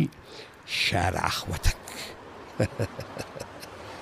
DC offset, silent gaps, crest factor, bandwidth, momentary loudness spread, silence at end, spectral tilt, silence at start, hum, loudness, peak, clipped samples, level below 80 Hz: under 0.1%; none; 24 dB; 15.5 kHz; 18 LU; 0 s; -4 dB/octave; 0 s; none; -30 LUFS; -6 dBFS; under 0.1%; -40 dBFS